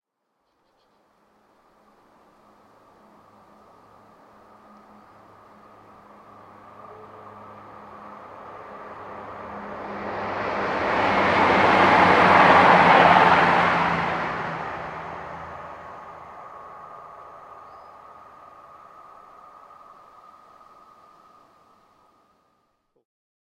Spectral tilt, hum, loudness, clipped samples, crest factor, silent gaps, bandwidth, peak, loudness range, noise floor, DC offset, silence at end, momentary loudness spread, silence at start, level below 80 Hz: -5.5 dB/octave; none; -18 LUFS; under 0.1%; 22 dB; none; 10.5 kHz; -2 dBFS; 27 LU; -74 dBFS; under 0.1%; 6.35 s; 29 LU; 6.9 s; -58 dBFS